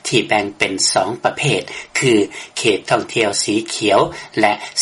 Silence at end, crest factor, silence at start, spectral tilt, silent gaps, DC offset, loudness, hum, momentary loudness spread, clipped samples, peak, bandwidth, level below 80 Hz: 0 s; 16 dB; 0.05 s; -3 dB/octave; none; under 0.1%; -17 LUFS; none; 5 LU; under 0.1%; 0 dBFS; 11.5 kHz; -54 dBFS